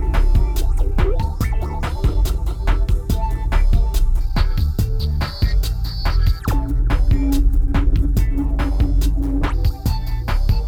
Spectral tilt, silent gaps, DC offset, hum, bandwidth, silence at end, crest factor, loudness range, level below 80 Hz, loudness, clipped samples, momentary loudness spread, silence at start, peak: -6.5 dB/octave; none; under 0.1%; none; 16 kHz; 0 s; 10 dB; 2 LU; -16 dBFS; -21 LUFS; under 0.1%; 4 LU; 0 s; -6 dBFS